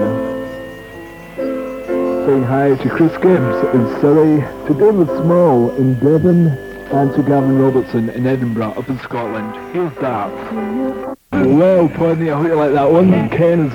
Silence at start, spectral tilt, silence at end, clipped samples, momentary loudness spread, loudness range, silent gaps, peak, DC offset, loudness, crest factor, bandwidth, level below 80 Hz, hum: 0 s; -9.5 dB/octave; 0 s; under 0.1%; 12 LU; 5 LU; none; 0 dBFS; under 0.1%; -15 LUFS; 14 dB; 17.5 kHz; -46 dBFS; none